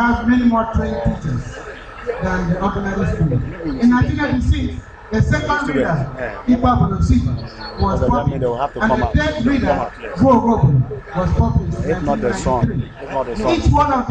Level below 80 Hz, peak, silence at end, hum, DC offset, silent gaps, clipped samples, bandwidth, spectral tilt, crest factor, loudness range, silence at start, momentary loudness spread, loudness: -26 dBFS; -4 dBFS; 0 s; none; under 0.1%; none; under 0.1%; 9 kHz; -7.5 dB/octave; 14 dB; 3 LU; 0 s; 10 LU; -18 LUFS